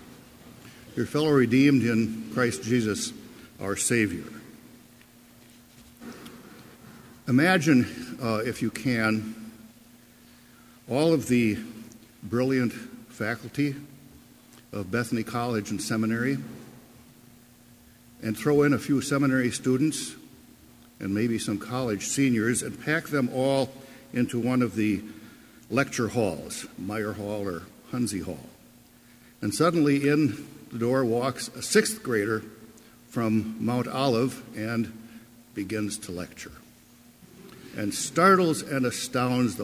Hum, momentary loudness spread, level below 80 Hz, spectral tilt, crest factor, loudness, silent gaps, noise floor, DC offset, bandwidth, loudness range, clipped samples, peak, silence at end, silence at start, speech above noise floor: none; 20 LU; -58 dBFS; -5 dB/octave; 22 dB; -26 LUFS; none; -54 dBFS; under 0.1%; 16 kHz; 6 LU; under 0.1%; -6 dBFS; 0 s; 0 s; 29 dB